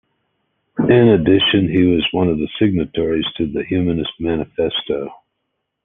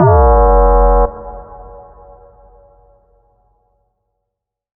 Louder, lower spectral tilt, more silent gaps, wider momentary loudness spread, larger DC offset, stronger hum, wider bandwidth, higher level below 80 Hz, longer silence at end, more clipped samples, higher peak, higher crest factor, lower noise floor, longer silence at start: second, -17 LUFS vs -11 LUFS; second, -10 dB/octave vs -14 dB/octave; neither; second, 10 LU vs 25 LU; neither; neither; first, 4 kHz vs 2.1 kHz; second, -44 dBFS vs -18 dBFS; second, 0.7 s vs 3.2 s; neither; about the same, 0 dBFS vs 0 dBFS; about the same, 16 dB vs 14 dB; second, -74 dBFS vs -78 dBFS; first, 0.75 s vs 0 s